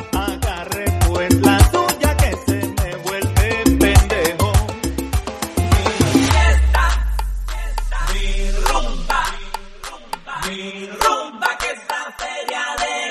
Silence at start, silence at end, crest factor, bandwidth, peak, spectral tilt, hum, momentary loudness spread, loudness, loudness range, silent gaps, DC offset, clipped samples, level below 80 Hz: 0 s; 0 s; 18 dB; 13.5 kHz; 0 dBFS; -5 dB/octave; none; 12 LU; -18 LUFS; 7 LU; none; under 0.1%; under 0.1%; -22 dBFS